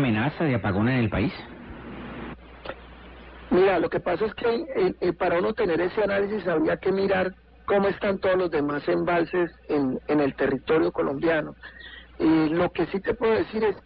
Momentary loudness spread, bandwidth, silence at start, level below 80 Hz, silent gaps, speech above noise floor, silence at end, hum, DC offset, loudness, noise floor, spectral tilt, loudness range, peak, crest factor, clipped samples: 17 LU; 5.2 kHz; 0 s; -48 dBFS; none; 21 dB; 0.05 s; none; under 0.1%; -24 LUFS; -44 dBFS; -11 dB/octave; 3 LU; -12 dBFS; 12 dB; under 0.1%